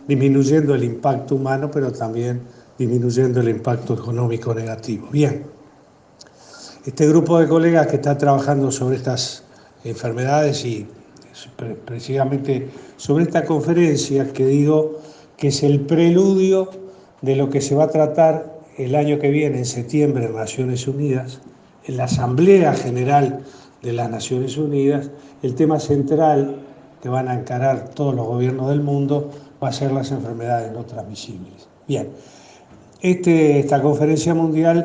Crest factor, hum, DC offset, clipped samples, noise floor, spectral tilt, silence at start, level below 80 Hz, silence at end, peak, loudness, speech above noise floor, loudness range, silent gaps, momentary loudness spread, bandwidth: 18 dB; none; under 0.1%; under 0.1%; -50 dBFS; -7 dB/octave; 0 s; -58 dBFS; 0 s; 0 dBFS; -18 LUFS; 32 dB; 6 LU; none; 16 LU; 9.6 kHz